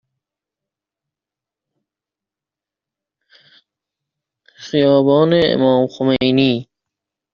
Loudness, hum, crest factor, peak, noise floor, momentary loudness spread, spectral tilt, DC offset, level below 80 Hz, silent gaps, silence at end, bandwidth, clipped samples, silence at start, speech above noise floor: -15 LUFS; none; 18 dB; -2 dBFS; -87 dBFS; 5 LU; -5 dB/octave; under 0.1%; -56 dBFS; none; 0.7 s; 7 kHz; under 0.1%; 4.6 s; 74 dB